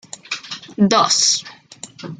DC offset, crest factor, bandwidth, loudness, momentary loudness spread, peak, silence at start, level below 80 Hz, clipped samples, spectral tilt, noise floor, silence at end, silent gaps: under 0.1%; 18 dB; 11 kHz; -16 LUFS; 22 LU; -2 dBFS; 0.3 s; -62 dBFS; under 0.1%; -2.5 dB/octave; -37 dBFS; 0.05 s; none